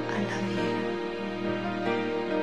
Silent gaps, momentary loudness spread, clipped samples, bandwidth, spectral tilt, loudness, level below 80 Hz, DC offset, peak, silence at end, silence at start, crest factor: none; 3 LU; under 0.1%; 11.5 kHz; -6 dB/octave; -30 LUFS; -62 dBFS; 0.3%; -14 dBFS; 0 s; 0 s; 14 dB